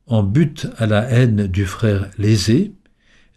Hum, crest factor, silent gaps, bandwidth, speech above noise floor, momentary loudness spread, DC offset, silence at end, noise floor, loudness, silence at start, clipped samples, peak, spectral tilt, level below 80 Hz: none; 12 dB; none; 13 kHz; 37 dB; 6 LU; under 0.1%; 0.65 s; -53 dBFS; -17 LUFS; 0.1 s; under 0.1%; -4 dBFS; -6.5 dB/octave; -42 dBFS